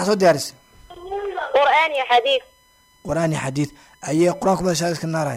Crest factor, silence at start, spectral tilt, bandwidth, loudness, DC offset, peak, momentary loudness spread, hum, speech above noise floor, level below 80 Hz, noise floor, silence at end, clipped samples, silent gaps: 16 dB; 0 s; -4.5 dB/octave; 16 kHz; -20 LUFS; under 0.1%; -6 dBFS; 14 LU; none; 37 dB; -52 dBFS; -56 dBFS; 0 s; under 0.1%; none